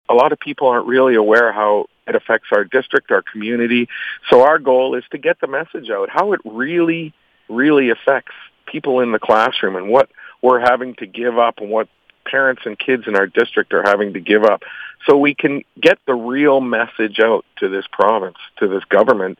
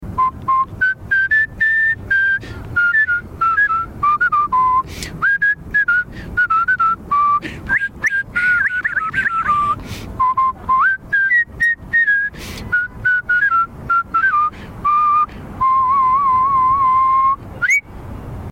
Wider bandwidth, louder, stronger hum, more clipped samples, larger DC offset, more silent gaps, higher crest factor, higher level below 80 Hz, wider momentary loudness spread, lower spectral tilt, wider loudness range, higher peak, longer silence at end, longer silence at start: second, 8.2 kHz vs 16.5 kHz; about the same, -16 LUFS vs -16 LUFS; neither; neither; neither; neither; about the same, 16 dB vs 14 dB; second, -62 dBFS vs -40 dBFS; first, 9 LU vs 6 LU; first, -6 dB/octave vs -4 dB/octave; about the same, 2 LU vs 2 LU; first, 0 dBFS vs -4 dBFS; about the same, 0.05 s vs 0 s; about the same, 0.1 s vs 0 s